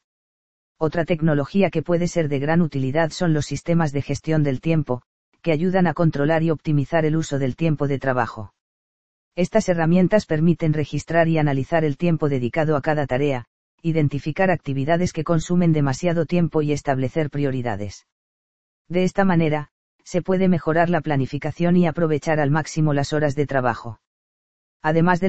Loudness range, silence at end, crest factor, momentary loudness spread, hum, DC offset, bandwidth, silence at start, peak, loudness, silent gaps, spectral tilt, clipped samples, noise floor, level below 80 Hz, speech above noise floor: 3 LU; 0 s; 18 dB; 7 LU; none; 2%; 8.2 kHz; 0 s; -2 dBFS; -21 LUFS; 0.04-0.75 s, 5.06-5.32 s, 8.60-9.31 s, 13.47-13.78 s, 18.12-18.85 s, 19.71-19.99 s, 24.07-24.80 s; -7 dB/octave; under 0.1%; under -90 dBFS; -48 dBFS; over 70 dB